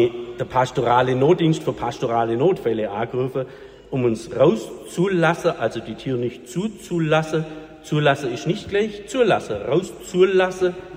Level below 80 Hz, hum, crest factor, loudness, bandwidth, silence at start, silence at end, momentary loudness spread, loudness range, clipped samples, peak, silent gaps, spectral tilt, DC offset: -52 dBFS; none; 18 dB; -21 LUFS; 15.5 kHz; 0 s; 0 s; 10 LU; 3 LU; under 0.1%; -4 dBFS; none; -6.5 dB/octave; under 0.1%